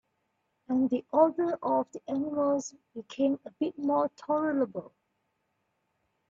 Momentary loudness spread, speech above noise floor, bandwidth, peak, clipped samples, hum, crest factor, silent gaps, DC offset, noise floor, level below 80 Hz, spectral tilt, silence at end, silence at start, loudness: 9 LU; 49 dB; 7.6 kHz; -10 dBFS; under 0.1%; none; 20 dB; none; under 0.1%; -78 dBFS; -76 dBFS; -6 dB/octave; 1.4 s; 0.7 s; -29 LUFS